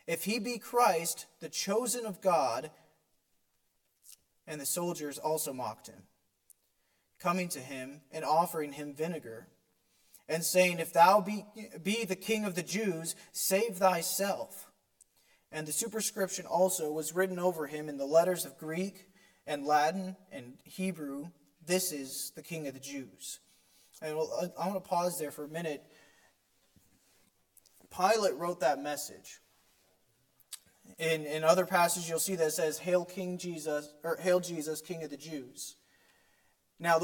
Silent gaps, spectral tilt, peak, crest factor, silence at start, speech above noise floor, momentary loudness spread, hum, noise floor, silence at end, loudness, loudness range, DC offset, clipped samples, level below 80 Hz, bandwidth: none; -3.5 dB/octave; -12 dBFS; 22 dB; 0.05 s; 44 dB; 16 LU; none; -76 dBFS; 0 s; -32 LUFS; 8 LU; under 0.1%; under 0.1%; -82 dBFS; 17.5 kHz